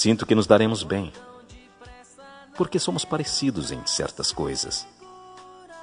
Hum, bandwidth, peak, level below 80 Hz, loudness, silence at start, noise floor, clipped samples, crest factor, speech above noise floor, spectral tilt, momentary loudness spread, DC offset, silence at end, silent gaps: none; 10 kHz; -2 dBFS; -52 dBFS; -24 LUFS; 0 s; -48 dBFS; under 0.1%; 22 dB; 24 dB; -4 dB/octave; 26 LU; under 0.1%; 0 s; none